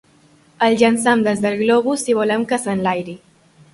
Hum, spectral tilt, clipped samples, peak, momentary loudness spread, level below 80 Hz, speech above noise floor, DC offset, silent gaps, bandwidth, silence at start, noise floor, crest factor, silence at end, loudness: none; -4.5 dB/octave; under 0.1%; -2 dBFS; 6 LU; -60 dBFS; 36 dB; under 0.1%; none; 11.5 kHz; 0.6 s; -52 dBFS; 16 dB; 0.55 s; -17 LUFS